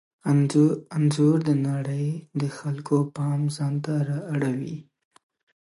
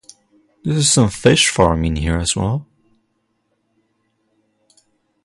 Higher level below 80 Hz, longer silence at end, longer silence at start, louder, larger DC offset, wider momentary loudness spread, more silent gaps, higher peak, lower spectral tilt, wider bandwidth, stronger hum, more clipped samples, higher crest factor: second, -70 dBFS vs -34 dBFS; second, 0.85 s vs 2.6 s; second, 0.25 s vs 0.65 s; second, -25 LUFS vs -16 LUFS; neither; about the same, 9 LU vs 10 LU; neither; second, -8 dBFS vs 0 dBFS; first, -7.5 dB/octave vs -4 dB/octave; about the same, 11.5 kHz vs 11.5 kHz; neither; neither; about the same, 16 dB vs 20 dB